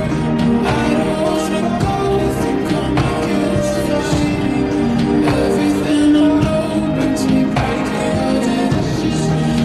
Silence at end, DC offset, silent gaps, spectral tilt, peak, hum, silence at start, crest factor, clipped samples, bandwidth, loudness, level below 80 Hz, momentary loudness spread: 0 s; under 0.1%; none; -6.5 dB/octave; -4 dBFS; none; 0 s; 12 dB; under 0.1%; 13 kHz; -16 LUFS; -32 dBFS; 4 LU